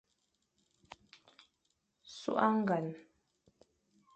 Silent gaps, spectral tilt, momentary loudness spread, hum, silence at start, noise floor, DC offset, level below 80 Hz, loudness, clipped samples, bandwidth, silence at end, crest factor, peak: none; -6.5 dB/octave; 25 LU; none; 2.1 s; -81 dBFS; under 0.1%; -80 dBFS; -34 LUFS; under 0.1%; 8.4 kHz; 1.15 s; 26 dB; -14 dBFS